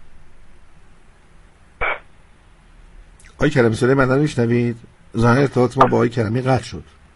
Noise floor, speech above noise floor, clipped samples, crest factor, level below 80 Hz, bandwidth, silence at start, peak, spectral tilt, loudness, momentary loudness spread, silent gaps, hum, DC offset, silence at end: -48 dBFS; 31 dB; under 0.1%; 20 dB; -42 dBFS; 11.5 kHz; 0 s; 0 dBFS; -7 dB/octave; -18 LUFS; 14 LU; none; none; under 0.1%; 0.35 s